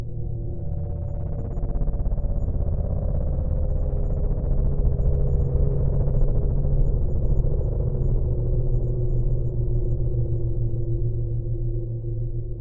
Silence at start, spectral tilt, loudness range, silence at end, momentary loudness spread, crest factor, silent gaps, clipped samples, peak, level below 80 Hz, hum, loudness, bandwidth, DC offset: 0 s; -14 dB/octave; 3 LU; 0 s; 6 LU; 14 dB; none; under 0.1%; -8 dBFS; -24 dBFS; none; -26 LUFS; 1.6 kHz; under 0.1%